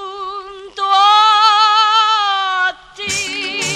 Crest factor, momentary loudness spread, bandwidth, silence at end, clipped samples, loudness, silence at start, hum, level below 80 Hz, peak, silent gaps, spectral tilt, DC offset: 14 dB; 17 LU; 14.5 kHz; 0 s; under 0.1%; -12 LUFS; 0 s; none; -56 dBFS; 0 dBFS; none; 0 dB/octave; under 0.1%